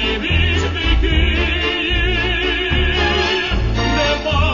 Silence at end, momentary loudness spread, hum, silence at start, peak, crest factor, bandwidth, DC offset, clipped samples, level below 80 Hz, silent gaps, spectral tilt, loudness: 0 s; 2 LU; none; 0 s; -2 dBFS; 14 dB; 7.4 kHz; 0.3%; under 0.1%; -20 dBFS; none; -5 dB/octave; -16 LUFS